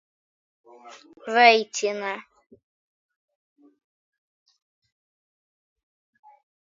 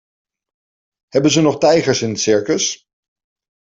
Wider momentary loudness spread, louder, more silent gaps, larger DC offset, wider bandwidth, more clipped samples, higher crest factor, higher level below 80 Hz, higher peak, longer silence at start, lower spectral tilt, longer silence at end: first, 20 LU vs 7 LU; second, -20 LUFS vs -15 LUFS; neither; neither; about the same, 7.6 kHz vs 7.8 kHz; neither; first, 28 dB vs 16 dB; second, -86 dBFS vs -56 dBFS; about the same, -2 dBFS vs -2 dBFS; second, 0.85 s vs 1.15 s; second, -1.5 dB/octave vs -4 dB/octave; first, 4.45 s vs 0.85 s